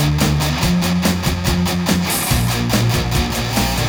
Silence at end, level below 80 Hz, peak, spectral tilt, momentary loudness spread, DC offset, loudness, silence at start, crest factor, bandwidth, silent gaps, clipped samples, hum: 0 s; -26 dBFS; -2 dBFS; -4.5 dB/octave; 2 LU; under 0.1%; -17 LUFS; 0 s; 14 dB; over 20 kHz; none; under 0.1%; none